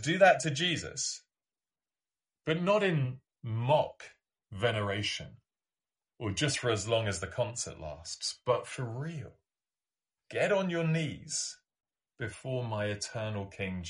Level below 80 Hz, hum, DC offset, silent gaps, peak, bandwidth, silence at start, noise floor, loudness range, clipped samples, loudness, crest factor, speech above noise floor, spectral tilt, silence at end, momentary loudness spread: -64 dBFS; none; under 0.1%; none; -10 dBFS; 11.5 kHz; 0 s; under -90 dBFS; 3 LU; under 0.1%; -32 LUFS; 22 dB; over 58 dB; -4 dB/octave; 0 s; 14 LU